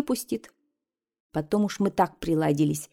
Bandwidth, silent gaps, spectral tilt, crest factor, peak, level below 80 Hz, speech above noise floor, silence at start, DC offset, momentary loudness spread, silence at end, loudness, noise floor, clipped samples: 17 kHz; 1.20-1.30 s; -6 dB/octave; 18 dB; -8 dBFS; -56 dBFS; 61 dB; 0 s; under 0.1%; 10 LU; 0.05 s; -27 LUFS; -86 dBFS; under 0.1%